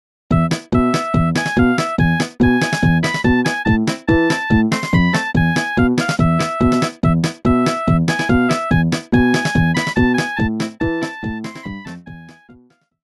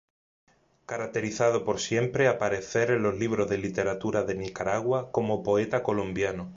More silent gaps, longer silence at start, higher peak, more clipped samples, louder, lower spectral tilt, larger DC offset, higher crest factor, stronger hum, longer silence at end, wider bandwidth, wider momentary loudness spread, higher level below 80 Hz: neither; second, 0.3 s vs 0.9 s; first, -2 dBFS vs -10 dBFS; neither; first, -16 LUFS vs -28 LUFS; about the same, -6 dB/octave vs -5.5 dB/octave; neither; about the same, 14 dB vs 18 dB; neither; first, 0.55 s vs 0 s; first, 12 kHz vs 7.8 kHz; about the same, 6 LU vs 6 LU; first, -32 dBFS vs -56 dBFS